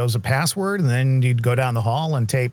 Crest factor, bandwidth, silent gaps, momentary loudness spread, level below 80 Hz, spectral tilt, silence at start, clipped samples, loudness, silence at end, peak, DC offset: 14 dB; 19 kHz; none; 3 LU; -58 dBFS; -5.5 dB/octave; 0 s; under 0.1%; -20 LUFS; 0 s; -6 dBFS; under 0.1%